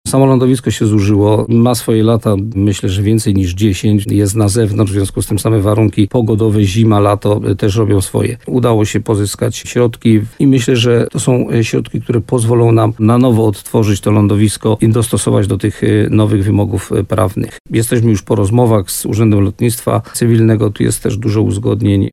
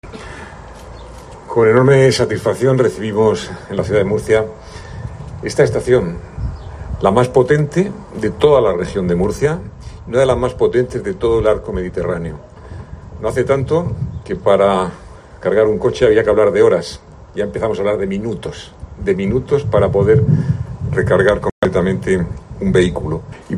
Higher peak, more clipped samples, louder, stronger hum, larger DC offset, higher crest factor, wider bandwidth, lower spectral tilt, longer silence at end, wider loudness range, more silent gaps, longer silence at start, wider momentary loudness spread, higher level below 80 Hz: about the same, 0 dBFS vs 0 dBFS; neither; first, -12 LUFS vs -16 LUFS; neither; neither; about the same, 12 dB vs 16 dB; first, 14.5 kHz vs 11.5 kHz; about the same, -6.5 dB/octave vs -7 dB/octave; about the same, 0.05 s vs 0 s; about the same, 2 LU vs 4 LU; second, 17.60-17.64 s vs 21.52-21.62 s; about the same, 0.05 s vs 0.05 s; second, 5 LU vs 20 LU; about the same, -38 dBFS vs -36 dBFS